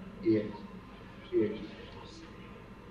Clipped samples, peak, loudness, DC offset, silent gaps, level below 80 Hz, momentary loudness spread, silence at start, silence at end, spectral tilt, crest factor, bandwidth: under 0.1%; -18 dBFS; -34 LUFS; under 0.1%; none; -58 dBFS; 19 LU; 0 s; 0 s; -8 dB/octave; 18 dB; 7.2 kHz